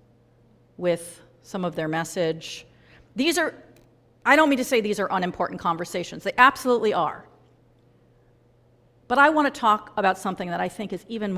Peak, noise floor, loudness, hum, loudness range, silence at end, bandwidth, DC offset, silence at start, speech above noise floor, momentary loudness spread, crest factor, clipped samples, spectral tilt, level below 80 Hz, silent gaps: -2 dBFS; -59 dBFS; -23 LUFS; none; 6 LU; 0 s; 16 kHz; under 0.1%; 0.8 s; 36 dB; 14 LU; 24 dB; under 0.1%; -4.5 dB/octave; -60 dBFS; none